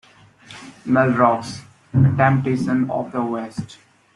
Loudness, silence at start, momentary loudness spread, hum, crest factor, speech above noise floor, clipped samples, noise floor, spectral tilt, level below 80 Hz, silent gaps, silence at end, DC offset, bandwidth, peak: -19 LUFS; 0.5 s; 21 LU; none; 18 dB; 28 dB; under 0.1%; -46 dBFS; -8 dB/octave; -54 dBFS; none; 0.4 s; under 0.1%; 11 kHz; -2 dBFS